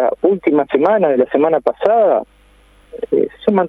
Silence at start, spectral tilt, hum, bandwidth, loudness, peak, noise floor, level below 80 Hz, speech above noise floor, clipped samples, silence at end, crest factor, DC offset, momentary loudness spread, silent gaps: 0 s; -9 dB/octave; 50 Hz at -50 dBFS; 5.2 kHz; -15 LUFS; 0 dBFS; -49 dBFS; -54 dBFS; 35 dB; under 0.1%; 0 s; 14 dB; under 0.1%; 5 LU; none